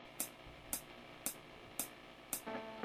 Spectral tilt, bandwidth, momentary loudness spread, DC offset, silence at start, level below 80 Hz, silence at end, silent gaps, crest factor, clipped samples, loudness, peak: -1.5 dB/octave; 19 kHz; 10 LU; under 0.1%; 0 s; -68 dBFS; 0 s; none; 30 dB; under 0.1%; -45 LUFS; -18 dBFS